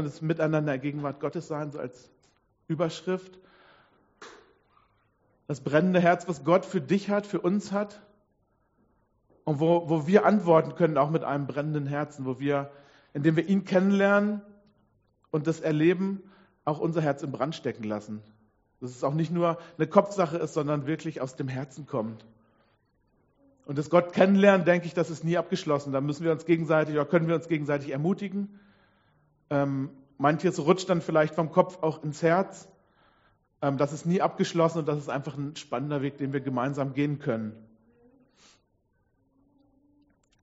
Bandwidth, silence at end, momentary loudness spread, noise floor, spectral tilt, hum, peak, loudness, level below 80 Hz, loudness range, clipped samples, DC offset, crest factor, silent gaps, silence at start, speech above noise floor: 8 kHz; 2.85 s; 12 LU; -71 dBFS; -6.5 dB/octave; none; -4 dBFS; -27 LUFS; -70 dBFS; 9 LU; under 0.1%; under 0.1%; 24 dB; none; 0 s; 45 dB